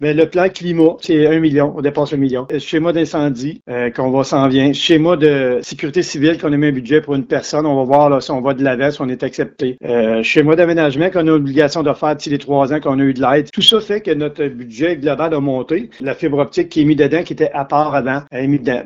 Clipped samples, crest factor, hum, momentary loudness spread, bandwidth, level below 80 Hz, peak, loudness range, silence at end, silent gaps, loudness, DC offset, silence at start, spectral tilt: under 0.1%; 14 dB; none; 8 LU; 11 kHz; -50 dBFS; 0 dBFS; 2 LU; 0 s; none; -15 LUFS; under 0.1%; 0 s; -6 dB/octave